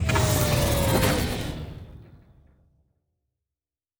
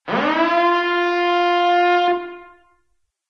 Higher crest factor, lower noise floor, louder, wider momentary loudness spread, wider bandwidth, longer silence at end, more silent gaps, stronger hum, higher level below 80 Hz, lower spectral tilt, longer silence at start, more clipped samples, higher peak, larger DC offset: first, 18 dB vs 12 dB; first, under -90 dBFS vs -68 dBFS; second, -23 LUFS vs -17 LUFS; first, 16 LU vs 5 LU; first, over 20 kHz vs 6.8 kHz; first, 1.85 s vs 0.85 s; neither; neither; first, -36 dBFS vs -68 dBFS; about the same, -4.5 dB/octave vs -5 dB/octave; about the same, 0 s vs 0.05 s; neither; about the same, -8 dBFS vs -6 dBFS; neither